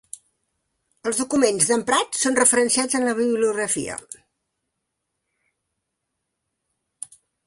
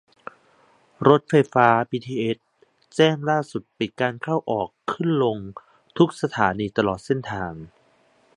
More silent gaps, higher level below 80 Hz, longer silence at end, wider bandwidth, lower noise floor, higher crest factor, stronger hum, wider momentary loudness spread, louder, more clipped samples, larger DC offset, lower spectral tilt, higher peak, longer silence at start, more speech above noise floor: neither; second, -64 dBFS vs -56 dBFS; first, 3.3 s vs 0.7 s; about the same, 11.5 kHz vs 11 kHz; first, -79 dBFS vs -60 dBFS; about the same, 22 dB vs 22 dB; neither; first, 22 LU vs 16 LU; about the same, -20 LUFS vs -22 LUFS; neither; neither; second, -2 dB/octave vs -6.5 dB/octave; about the same, -2 dBFS vs 0 dBFS; about the same, 1.05 s vs 1 s; first, 58 dB vs 39 dB